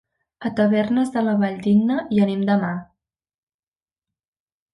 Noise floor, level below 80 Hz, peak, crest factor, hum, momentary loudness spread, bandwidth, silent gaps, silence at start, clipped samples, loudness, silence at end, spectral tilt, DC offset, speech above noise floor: under -90 dBFS; -62 dBFS; -8 dBFS; 14 dB; none; 9 LU; 11 kHz; none; 0.4 s; under 0.1%; -20 LUFS; 1.9 s; -8 dB/octave; under 0.1%; over 71 dB